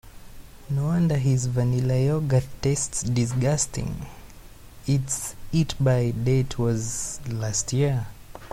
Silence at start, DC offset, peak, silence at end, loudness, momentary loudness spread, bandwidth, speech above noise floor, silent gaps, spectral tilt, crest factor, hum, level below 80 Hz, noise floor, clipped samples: 0.05 s; under 0.1%; -10 dBFS; 0 s; -24 LUFS; 8 LU; 15.5 kHz; 21 dB; none; -5.5 dB/octave; 16 dB; none; -44 dBFS; -44 dBFS; under 0.1%